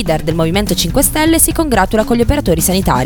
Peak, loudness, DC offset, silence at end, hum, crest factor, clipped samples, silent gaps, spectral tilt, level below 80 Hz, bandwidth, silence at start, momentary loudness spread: 0 dBFS; -12 LUFS; under 0.1%; 0 s; none; 12 dB; under 0.1%; none; -4 dB/octave; -24 dBFS; 19.5 kHz; 0 s; 4 LU